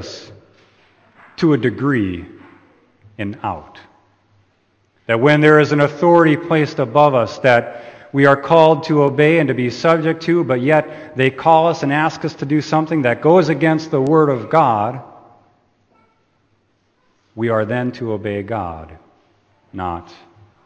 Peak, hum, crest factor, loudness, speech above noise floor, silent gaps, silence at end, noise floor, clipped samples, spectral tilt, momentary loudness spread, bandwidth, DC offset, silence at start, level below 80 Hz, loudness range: 0 dBFS; none; 16 dB; -15 LUFS; 47 dB; none; 0.65 s; -62 dBFS; under 0.1%; -7 dB/octave; 16 LU; 8.6 kHz; under 0.1%; 0 s; -54 dBFS; 10 LU